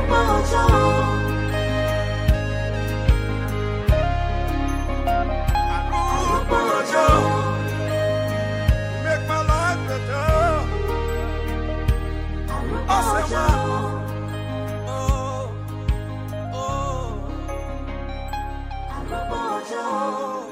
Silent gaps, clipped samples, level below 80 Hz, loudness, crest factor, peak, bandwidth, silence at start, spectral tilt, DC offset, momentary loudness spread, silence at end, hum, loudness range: none; under 0.1%; -26 dBFS; -23 LUFS; 20 dB; -2 dBFS; 16 kHz; 0 s; -6 dB/octave; under 0.1%; 11 LU; 0 s; none; 8 LU